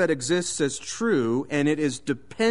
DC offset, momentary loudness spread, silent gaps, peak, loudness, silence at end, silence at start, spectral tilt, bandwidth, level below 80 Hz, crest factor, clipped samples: 0.4%; 5 LU; none; -10 dBFS; -25 LUFS; 0 s; 0 s; -4.5 dB/octave; 11 kHz; -60 dBFS; 14 dB; under 0.1%